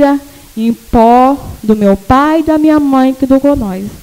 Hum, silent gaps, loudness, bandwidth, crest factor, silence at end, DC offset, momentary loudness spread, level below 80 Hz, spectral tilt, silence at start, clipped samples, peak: none; none; -10 LUFS; 16.5 kHz; 10 dB; 0.05 s; under 0.1%; 10 LU; -30 dBFS; -7 dB/octave; 0 s; 0.2%; 0 dBFS